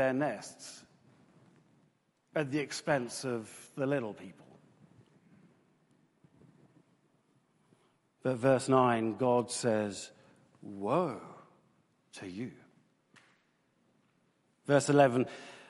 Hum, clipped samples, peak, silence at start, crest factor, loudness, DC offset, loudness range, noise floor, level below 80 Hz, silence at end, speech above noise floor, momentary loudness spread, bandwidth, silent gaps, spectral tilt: none; under 0.1%; -10 dBFS; 0 s; 24 dB; -31 LUFS; under 0.1%; 12 LU; -73 dBFS; -76 dBFS; 0.05 s; 42 dB; 22 LU; 11.5 kHz; none; -5.5 dB/octave